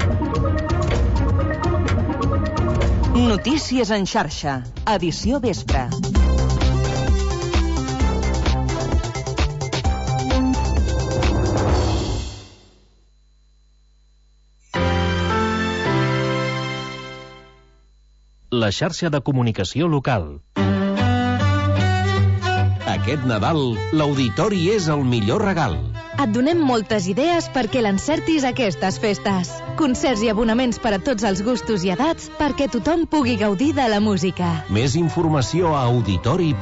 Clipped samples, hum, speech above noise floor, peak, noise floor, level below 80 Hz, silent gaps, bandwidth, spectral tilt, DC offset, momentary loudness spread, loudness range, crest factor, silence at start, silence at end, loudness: under 0.1%; 50 Hz at -40 dBFS; 35 dB; -8 dBFS; -55 dBFS; -28 dBFS; none; 8 kHz; -6 dB/octave; under 0.1%; 5 LU; 5 LU; 12 dB; 0 s; 0 s; -20 LUFS